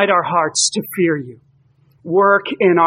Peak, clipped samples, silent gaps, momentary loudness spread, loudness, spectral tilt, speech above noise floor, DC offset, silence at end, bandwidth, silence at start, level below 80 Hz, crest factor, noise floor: -2 dBFS; under 0.1%; none; 7 LU; -16 LUFS; -3.5 dB/octave; 39 dB; under 0.1%; 0 s; 15.5 kHz; 0 s; -68 dBFS; 16 dB; -55 dBFS